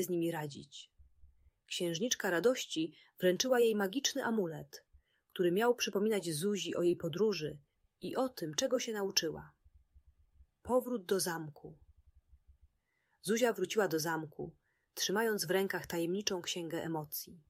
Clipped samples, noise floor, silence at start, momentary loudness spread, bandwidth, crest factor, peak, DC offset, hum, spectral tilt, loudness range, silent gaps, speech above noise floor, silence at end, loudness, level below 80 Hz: under 0.1%; -79 dBFS; 0 s; 16 LU; 16 kHz; 20 dB; -16 dBFS; under 0.1%; none; -3.5 dB/octave; 5 LU; none; 45 dB; 0.1 s; -35 LUFS; -70 dBFS